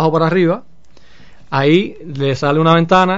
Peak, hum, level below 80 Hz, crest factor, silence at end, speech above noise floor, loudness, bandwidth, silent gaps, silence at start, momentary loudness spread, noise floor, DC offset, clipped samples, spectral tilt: 0 dBFS; none; -48 dBFS; 14 dB; 0 s; 34 dB; -14 LUFS; 7.8 kHz; none; 0 s; 10 LU; -48 dBFS; 2%; under 0.1%; -7 dB/octave